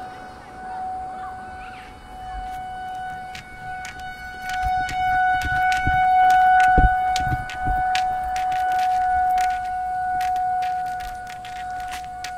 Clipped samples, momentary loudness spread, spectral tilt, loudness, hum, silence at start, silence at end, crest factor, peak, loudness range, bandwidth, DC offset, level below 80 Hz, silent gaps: under 0.1%; 19 LU; -4 dB/octave; -22 LUFS; none; 0 s; 0 s; 20 dB; -4 dBFS; 15 LU; 14.5 kHz; under 0.1%; -36 dBFS; none